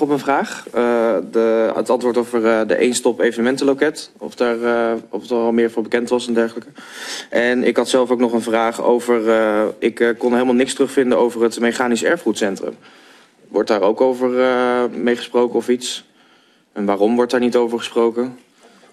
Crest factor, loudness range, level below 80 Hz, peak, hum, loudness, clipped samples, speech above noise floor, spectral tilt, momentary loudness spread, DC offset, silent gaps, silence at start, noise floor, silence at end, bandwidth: 16 dB; 3 LU; -62 dBFS; -2 dBFS; none; -17 LUFS; under 0.1%; 37 dB; -4 dB/octave; 8 LU; under 0.1%; none; 0 s; -54 dBFS; 0.55 s; 13 kHz